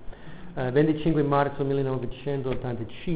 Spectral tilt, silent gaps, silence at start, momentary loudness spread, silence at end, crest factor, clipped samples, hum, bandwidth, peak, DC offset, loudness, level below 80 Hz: -11.5 dB/octave; none; 0 s; 13 LU; 0 s; 16 dB; under 0.1%; none; 4 kHz; -10 dBFS; 1%; -26 LUFS; -46 dBFS